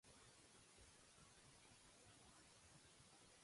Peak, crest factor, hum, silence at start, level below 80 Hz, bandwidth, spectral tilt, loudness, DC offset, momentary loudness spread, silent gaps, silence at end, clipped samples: -54 dBFS; 14 dB; none; 0.05 s; -82 dBFS; 11.5 kHz; -2.5 dB/octave; -67 LUFS; under 0.1%; 1 LU; none; 0 s; under 0.1%